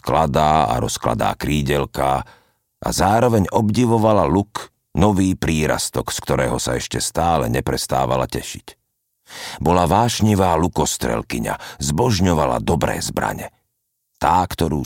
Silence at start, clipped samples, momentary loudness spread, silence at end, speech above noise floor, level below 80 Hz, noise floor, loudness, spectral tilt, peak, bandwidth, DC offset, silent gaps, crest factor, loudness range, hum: 0.05 s; under 0.1%; 10 LU; 0 s; 54 dB; -36 dBFS; -73 dBFS; -19 LUFS; -5 dB/octave; -2 dBFS; 17 kHz; under 0.1%; none; 18 dB; 3 LU; none